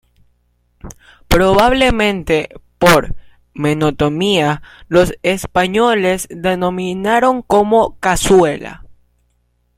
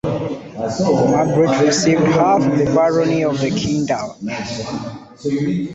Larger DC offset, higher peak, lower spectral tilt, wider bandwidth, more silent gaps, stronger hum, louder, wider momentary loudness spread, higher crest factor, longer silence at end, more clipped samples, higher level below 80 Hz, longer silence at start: neither; about the same, 0 dBFS vs -2 dBFS; about the same, -5 dB/octave vs -5.5 dB/octave; first, 16.5 kHz vs 8.2 kHz; neither; first, 60 Hz at -45 dBFS vs none; first, -14 LUFS vs -17 LUFS; second, 8 LU vs 12 LU; about the same, 14 dB vs 14 dB; first, 0.85 s vs 0 s; neither; first, -32 dBFS vs -48 dBFS; first, 0.85 s vs 0.05 s